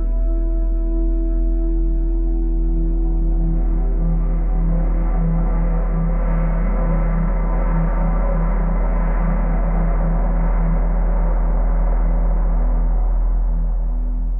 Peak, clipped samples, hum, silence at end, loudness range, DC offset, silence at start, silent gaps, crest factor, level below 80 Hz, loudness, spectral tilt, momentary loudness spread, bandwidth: -8 dBFS; under 0.1%; none; 0 s; 1 LU; 0.7%; 0 s; none; 8 dB; -16 dBFS; -22 LUFS; -12.5 dB/octave; 2 LU; 2.4 kHz